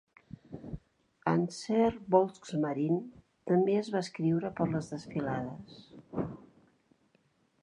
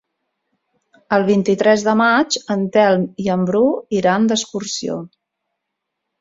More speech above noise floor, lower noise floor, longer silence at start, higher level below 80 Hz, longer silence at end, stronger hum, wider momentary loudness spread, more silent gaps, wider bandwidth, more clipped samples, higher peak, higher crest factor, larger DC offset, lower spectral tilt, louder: second, 40 dB vs 62 dB; second, -71 dBFS vs -78 dBFS; second, 0.5 s vs 1.1 s; about the same, -62 dBFS vs -60 dBFS; about the same, 1.2 s vs 1.15 s; neither; first, 21 LU vs 9 LU; neither; first, 11 kHz vs 7.8 kHz; neither; second, -12 dBFS vs -2 dBFS; first, 22 dB vs 16 dB; neither; first, -7.5 dB/octave vs -5 dB/octave; second, -32 LUFS vs -17 LUFS